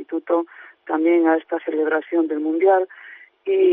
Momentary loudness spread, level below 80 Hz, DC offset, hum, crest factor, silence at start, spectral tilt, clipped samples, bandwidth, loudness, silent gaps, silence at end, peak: 15 LU; -74 dBFS; under 0.1%; none; 14 dB; 0 s; -2 dB/octave; under 0.1%; 3.7 kHz; -20 LUFS; none; 0 s; -6 dBFS